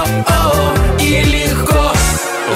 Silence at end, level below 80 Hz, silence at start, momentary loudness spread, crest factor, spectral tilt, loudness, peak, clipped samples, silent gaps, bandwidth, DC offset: 0 s; -18 dBFS; 0 s; 2 LU; 12 dB; -4.5 dB/octave; -13 LUFS; -2 dBFS; under 0.1%; none; 16.5 kHz; under 0.1%